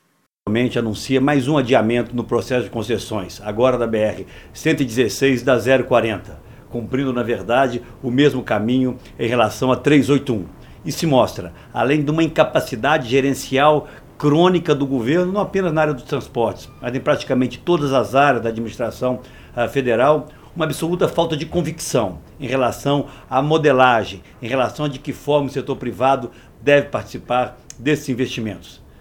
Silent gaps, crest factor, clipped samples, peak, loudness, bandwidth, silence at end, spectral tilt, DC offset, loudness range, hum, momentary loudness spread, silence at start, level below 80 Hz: none; 18 dB; under 0.1%; 0 dBFS; -19 LUFS; 18.5 kHz; 0.3 s; -6 dB/octave; under 0.1%; 3 LU; none; 11 LU; 0.45 s; -46 dBFS